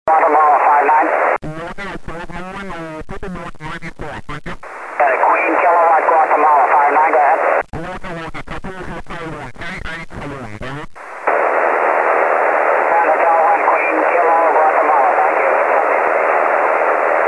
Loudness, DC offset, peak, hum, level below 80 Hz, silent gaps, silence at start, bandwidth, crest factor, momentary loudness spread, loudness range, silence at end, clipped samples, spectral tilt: -13 LUFS; 0.2%; -2 dBFS; none; -40 dBFS; none; 0.05 s; 11 kHz; 14 dB; 17 LU; 14 LU; 0 s; under 0.1%; -6 dB/octave